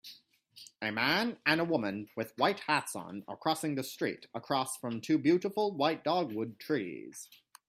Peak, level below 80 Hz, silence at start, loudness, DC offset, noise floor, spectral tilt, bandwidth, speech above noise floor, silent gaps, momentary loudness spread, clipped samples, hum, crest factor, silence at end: -10 dBFS; -76 dBFS; 0.05 s; -32 LUFS; under 0.1%; -59 dBFS; -4.5 dB/octave; 16 kHz; 26 dB; none; 15 LU; under 0.1%; none; 22 dB; 0.35 s